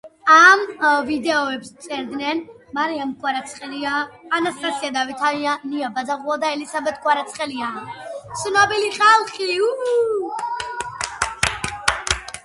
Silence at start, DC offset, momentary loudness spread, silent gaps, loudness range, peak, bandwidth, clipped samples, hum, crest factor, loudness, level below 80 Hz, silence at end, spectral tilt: 0.05 s; under 0.1%; 14 LU; none; 5 LU; 0 dBFS; 11.5 kHz; under 0.1%; none; 20 dB; -19 LUFS; -48 dBFS; 0.05 s; -2.5 dB/octave